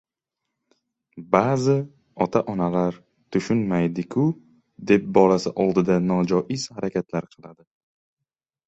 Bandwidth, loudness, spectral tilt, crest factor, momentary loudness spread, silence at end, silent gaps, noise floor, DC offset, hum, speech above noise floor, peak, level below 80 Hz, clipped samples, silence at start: 8.2 kHz; -22 LUFS; -7 dB/octave; 22 dB; 9 LU; 1.15 s; none; -85 dBFS; under 0.1%; none; 63 dB; -2 dBFS; -58 dBFS; under 0.1%; 1.15 s